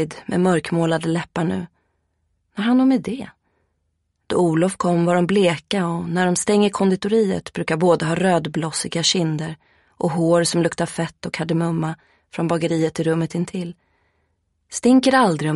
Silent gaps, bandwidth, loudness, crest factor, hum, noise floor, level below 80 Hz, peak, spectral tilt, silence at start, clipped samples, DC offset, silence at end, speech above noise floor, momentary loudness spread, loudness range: none; 11.5 kHz; -20 LUFS; 18 dB; none; -71 dBFS; -58 dBFS; -4 dBFS; -5.5 dB/octave; 0 s; under 0.1%; under 0.1%; 0 s; 52 dB; 11 LU; 5 LU